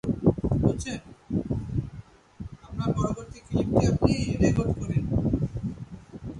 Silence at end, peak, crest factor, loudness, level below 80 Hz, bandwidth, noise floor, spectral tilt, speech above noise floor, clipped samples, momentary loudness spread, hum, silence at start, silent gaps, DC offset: 0 s; -4 dBFS; 22 dB; -27 LUFS; -38 dBFS; 11.5 kHz; -46 dBFS; -7.5 dB/octave; 21 dB; under 0.1%; 18 LU; none; 0.05 s; none; under 0.1%